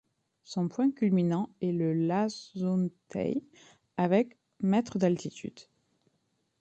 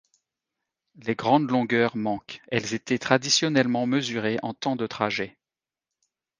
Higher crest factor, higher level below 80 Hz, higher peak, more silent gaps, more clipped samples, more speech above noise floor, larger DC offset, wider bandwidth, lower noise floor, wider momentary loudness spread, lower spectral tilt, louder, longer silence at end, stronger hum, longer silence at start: second, 18 dB vs 26 dB; about the same, -70 dBFS vs -66 dBFS; second, -12 dBFS vs -2 dBFS; neither; neither; second, 47 dB vs over 65 dB; neither; second, 8.4 kHz vs 10 kHz; second, -76 dBFS vs under -90 dBFS; about the same, 10 LU vs 10 LU; first, -7.5 dB/octave vs -4 dB/octave; second, -30 LUFS vs -25 LUFS; about the same, 1 s vs 1.1 s; neither; second, 0.5 s vs 1 s